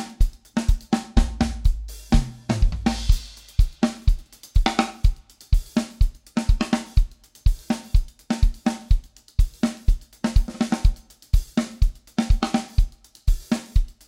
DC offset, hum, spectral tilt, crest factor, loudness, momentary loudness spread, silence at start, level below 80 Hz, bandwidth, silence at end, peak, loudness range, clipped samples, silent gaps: under 0.1%; none; -6 dB/octave; 18 dB; -25 LUFS; 5 LU; 0 s; -22 dBFS; 14 kHz; 0.15 s; -2 dBFS; 1 LU; under 0.1%; none